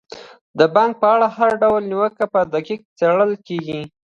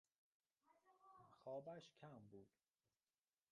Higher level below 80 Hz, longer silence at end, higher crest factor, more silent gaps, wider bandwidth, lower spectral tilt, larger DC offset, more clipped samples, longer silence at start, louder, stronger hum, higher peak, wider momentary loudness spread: first, -60 dBFS vs under -90 dBFS; second, 0.2 s vs 1.05 s; about the same, 16 dB vs 20 dB; first, 0.41-0.54 s, 2.85-2.96 s vs none; about the same, 7.4 kHz vs 6.8 kHz; about the same, -6.5 dB/octave vs -5.5 dB/octave; neither; neither; second, 0.1 s vs 0.65 s; first, -17 LUFS vs -59 LUFS; neither; first, 0 dBFS vs -42 dBFS; about the same, 11 LU vs 13 LU